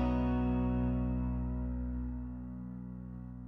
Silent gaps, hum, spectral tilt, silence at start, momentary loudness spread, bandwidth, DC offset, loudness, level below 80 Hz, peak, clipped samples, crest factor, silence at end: none; none; -11 dB/octave; 0 s; 13 LU; 4.7 kHz; under 0.1%; -36 LUFS; -40 dBFS; -22 dBFS; under 0.1%; 14 dB; 0 s